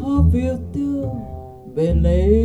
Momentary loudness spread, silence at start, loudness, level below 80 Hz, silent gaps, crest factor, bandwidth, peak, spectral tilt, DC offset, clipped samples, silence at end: 14 LU; 0 s; -20 LUFS; -24 dBFS; none; 16 dB; 8 kHz; -2 dBFS; -10 dB/octave; under 0.1%; under 0.1%; 0 s